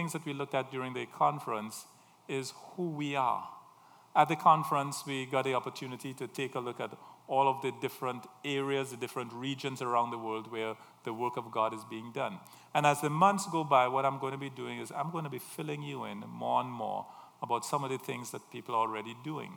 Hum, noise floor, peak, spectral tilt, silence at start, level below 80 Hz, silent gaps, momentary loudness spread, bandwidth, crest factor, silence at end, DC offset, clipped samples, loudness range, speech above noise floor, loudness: none; -59 dBFS; -10 dBFS; -5 dB/octave; 0 s; -90 dBFS; none; 14 LU; over 20 kHz; 22 dB; 0 s; under 0.1%; under 0.1%; 6 LU; 26 dB; -33 LUFS